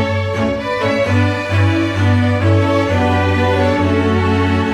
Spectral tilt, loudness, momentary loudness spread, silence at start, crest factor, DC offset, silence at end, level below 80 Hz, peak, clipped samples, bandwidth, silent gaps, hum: -7 dB/octave; -15 LUFS; 4 LU; 0 s; 12 dB; under 0.1%; 0 s; -38 dBFS; -2 dBFS; under 0.1%; 9.6 kHz; none; none